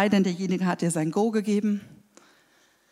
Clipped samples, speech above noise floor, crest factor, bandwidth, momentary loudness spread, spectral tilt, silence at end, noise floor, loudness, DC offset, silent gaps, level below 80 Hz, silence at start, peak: under 0.1%; 38 dB; 18 dB; 13 kHz; 4 LU; -6 dB/octave; 1 s; -63 dBFS; -25 LUFS; under 0.1%; none; -72 dBFS; 0 s; -8 dBFS